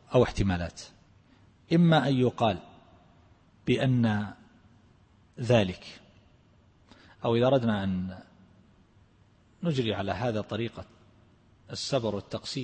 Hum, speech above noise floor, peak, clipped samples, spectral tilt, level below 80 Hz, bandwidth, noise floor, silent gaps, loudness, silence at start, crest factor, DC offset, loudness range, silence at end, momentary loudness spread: none; 34 dB; -10 dBFS; under 0.1%; -6.5 dB/octave; -52 dBFS; 8.8 kHz; -61 dBFS; none; -28 LUFS; 0.1 s; 20 dB; under 0.1%; 7 LU; 0 s; 16 LU